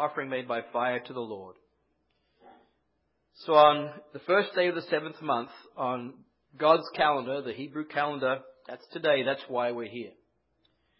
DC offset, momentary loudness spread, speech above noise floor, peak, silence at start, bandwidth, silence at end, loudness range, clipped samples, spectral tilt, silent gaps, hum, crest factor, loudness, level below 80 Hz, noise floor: under 0.1%; 18 LU; 48 dB; -6 dBFS; 0 s; 5.8 kHz; 0.9 s; 5 LU; under 0.1%; -8.5 dB/octave; none; none; 24 dB; -28 LUFS; -76 dBFS; -76 dBFS